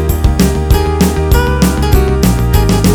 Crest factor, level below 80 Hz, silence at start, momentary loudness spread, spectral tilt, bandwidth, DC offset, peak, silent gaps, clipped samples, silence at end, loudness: 10 dB; -14 dBFS; 0 s; 2 LU; -6 dB/octave; over 20 kHz; under 0.1%; 0 dBFS; none; 0.5%; 0 s; -11 LUFS